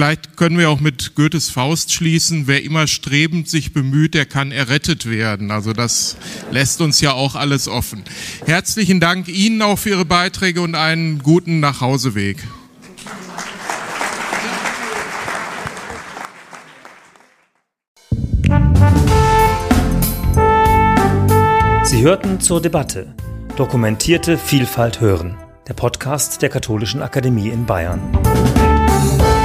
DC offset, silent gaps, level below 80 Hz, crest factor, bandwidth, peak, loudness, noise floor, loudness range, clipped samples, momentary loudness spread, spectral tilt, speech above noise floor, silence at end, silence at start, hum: under 0.1%; 17.88-17.96 s; -26 dBFS; 16 dB; 15.5 kHz; 0 dBFS; -15 LUFS; -62 dBFS; 9 LU; under 0.1%; 13 LU; -4.5 dB/octave; 46 dB; 0 s; 0 s; none